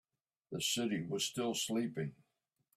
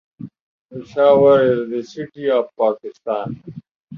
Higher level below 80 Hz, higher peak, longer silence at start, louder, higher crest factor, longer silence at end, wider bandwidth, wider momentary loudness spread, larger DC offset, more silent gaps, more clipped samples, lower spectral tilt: second, -76 dBFS vs -60 dBFS; second, -22 dBFS vs -2 dBFS; first, 0.5 s vs 0.2 s; second, -37 LUFS vs -17 LUFS; about the same, 16 dB vs 16 dB; first, 0.65 s vs 0 s; first, 16 kHz vs 6.8 kHz; second, 9 LU vs 26 LU; neither; second, none vs 0.41-0.69 s, 3.71-3.88 s; neither; second, -3.5 dB/octave vs -7.5 dB/octave